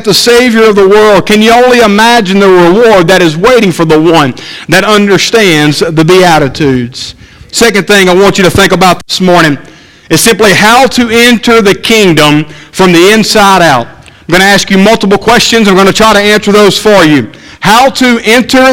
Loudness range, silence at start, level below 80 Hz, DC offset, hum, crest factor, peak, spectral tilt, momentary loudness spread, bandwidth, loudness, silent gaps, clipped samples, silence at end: 2 LU; 0 s; -32 dBFS; under 0.1%; none; 4 dB; 0 dBFS; -4 dB/octave; 6 LU; over 20 kHz; -4 LUFS; none; 9%; 0 s